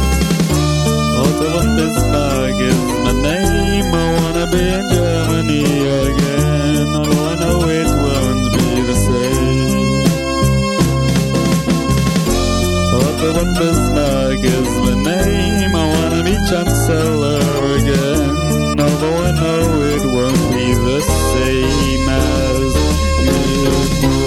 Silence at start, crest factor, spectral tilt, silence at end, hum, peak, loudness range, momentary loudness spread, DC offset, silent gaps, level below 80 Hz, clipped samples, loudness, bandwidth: 0 s; 14 dB; -5.5 dB/octave; 0 s; none; 0 dBFS; 0 LU; 1 LU; under 0.1%; none; -22 dBFS; under 0.1%; -15 LUFS; 16.5 kHz